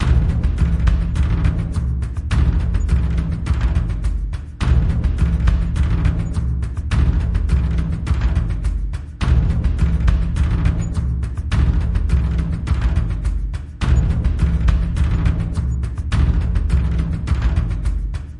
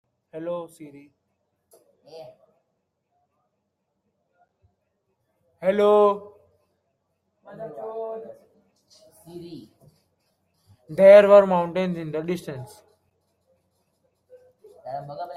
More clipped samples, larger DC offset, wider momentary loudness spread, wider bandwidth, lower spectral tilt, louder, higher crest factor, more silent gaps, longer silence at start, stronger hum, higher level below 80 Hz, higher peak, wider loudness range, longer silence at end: neither; neither; second, 6 LU vs 28 LU; about the same, 10.5 kHz vs 11.5 kHz; about the same, -7.5 dB/octave vs -7 dB/octave; about the same, -20 LUFS vs -19 LUFS; second, 14 dB vs 24 dB; neither; second, 0 s vs 0.35 s; neither; first, -20 dBFS vs -72 dBFS; about the same, -2 dBFS vs -2 dBFS; second, 1 LU vs 21 LU; about the same, 0 s vs 0 s